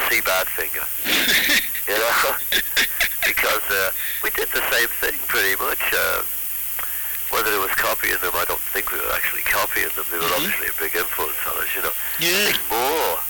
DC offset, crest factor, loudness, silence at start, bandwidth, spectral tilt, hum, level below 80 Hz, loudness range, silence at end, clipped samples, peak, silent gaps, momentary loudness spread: under 0.1%; 18 dB; -19 LUFS; 0 s; 19.5 kHz; -0.5 dB/octave; none; -48 dBFS; 2 LU; 0 s; under 0.1%; -2 dBFS; none; 4 LU